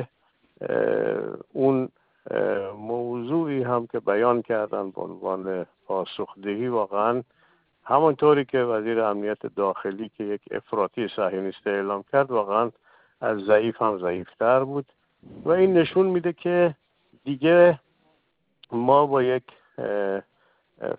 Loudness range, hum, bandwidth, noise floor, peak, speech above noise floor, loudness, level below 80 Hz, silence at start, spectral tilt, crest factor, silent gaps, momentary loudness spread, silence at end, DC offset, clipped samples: 5 LU; none; 4.8 kHz; -70 dBFS; -4 dBFS; 47 dB; -24 LUFS; -68 dBFS; 0 s; -11 dB/octave; 20 dB; none; 13 LU; 0 s; under 0.1%; under 0.1%